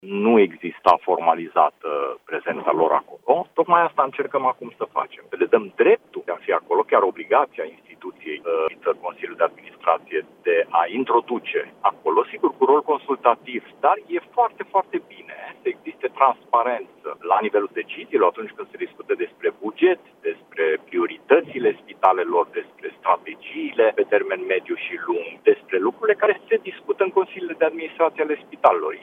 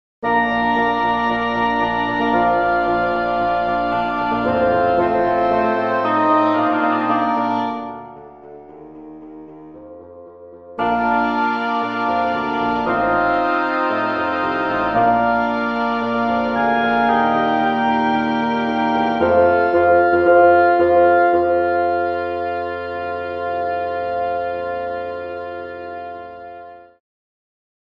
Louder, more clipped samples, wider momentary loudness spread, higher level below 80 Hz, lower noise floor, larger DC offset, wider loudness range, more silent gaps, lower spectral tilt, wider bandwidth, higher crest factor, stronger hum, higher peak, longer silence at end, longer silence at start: second, -22 LUFS vs -18 LUFS; neither; about the same, 12 LU vs 14 LU; second, -74 dBFS vs -48 dBFS; about the same, -39 dBFS vs -39 dBFS; neither; second, 3 LU vs 10 LU; neither; about the same, -7 dB/octave vs -7 dB/octave; second, 5 kHz vs 6.4 kHz; first, 22 dB vs 16 dB; neither; about the same, 0 dBFS vs -2 dBFS; second, 0 s vs 1.15 s; second, 0.05 s vs 0.2 s